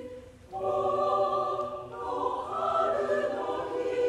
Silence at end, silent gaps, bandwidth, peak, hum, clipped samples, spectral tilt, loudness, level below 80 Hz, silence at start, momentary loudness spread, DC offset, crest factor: 0 s; none; 11.5 kHz; -16 dBFS; none; under 0.1%; -5.5 dB/octave; -30 LUFS; -60 dBFS; 0 s; 10 LU; under 0.1%; 14 dB